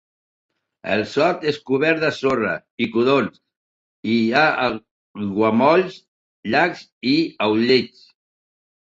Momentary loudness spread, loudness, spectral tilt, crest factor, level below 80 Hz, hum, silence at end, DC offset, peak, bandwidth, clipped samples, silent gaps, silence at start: 13 LU; -19 LUFS; -6 dB/octave; 20 dB; -60 dBFS; none; 1.05 s; under 0.1%; -2 dBFS; 7.8 kHz; under 0.1%; 2.71-2.78 s, 3.56-4.03 s, 4.91-5.14 s, 6.08-6.43 s, 6.92-7.01 s; 0.85 s